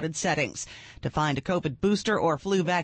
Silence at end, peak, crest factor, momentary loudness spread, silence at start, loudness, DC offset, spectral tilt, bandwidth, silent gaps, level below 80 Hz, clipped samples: 0 s; -12 dBFS; 14 dB; 10 LU; 0 s; -27 LUFS; under 0.1%; -5 dB/octave; 8.8 kHz; none; -52 dBFS; under 0.1%